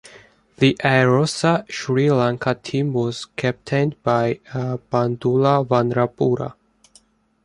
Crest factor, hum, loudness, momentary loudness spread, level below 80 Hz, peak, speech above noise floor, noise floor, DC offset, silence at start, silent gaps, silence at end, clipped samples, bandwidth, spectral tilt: 18 dB; none; -20 LUFS; 8 LU; -56 dBFS; -2 dBFS; 37 dB; -56 dBFS; under 0.1%; 0.15 s; none; 0.9 s; under 0.1%; 11 kHz; -6.5 dB/octave